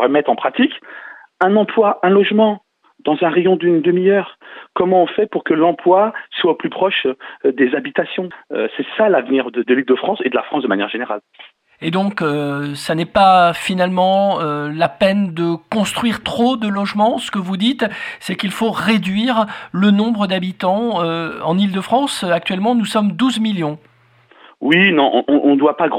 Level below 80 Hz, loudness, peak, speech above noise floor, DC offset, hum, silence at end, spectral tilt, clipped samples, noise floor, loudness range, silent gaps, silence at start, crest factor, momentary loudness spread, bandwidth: -56 dBFS; -16 LUFS; 0 dBFS; 34 dB; under 0.1%; none; 0 s; -6 dB/octave; under 0.1%; -50 dBFS; 3 LU; none; 0 s; 16 dB; 9 LU; 15 kHz